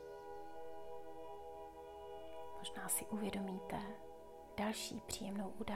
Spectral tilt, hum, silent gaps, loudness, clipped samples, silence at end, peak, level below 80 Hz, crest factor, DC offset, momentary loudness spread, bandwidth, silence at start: -3.5 dB/octave; 50 Hz at -75 dBFS; none; -46 LUFS; under 0.1%; 0 s; -24 dBFS; -66 dBFS; 20 dB; under 0.1%; 13 LU; 16 kHz; 0 s